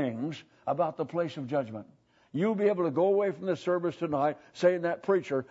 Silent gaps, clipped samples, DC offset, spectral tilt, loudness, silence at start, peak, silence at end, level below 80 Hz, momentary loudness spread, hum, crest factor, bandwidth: none; under 0.1%; under 0.1%; -7.5 dB/octave; -30 LUFS; 0 s; -12 dBFS; 0.05 s; -76 dBFS; 10 LU; none; 18 dB; 8 kHz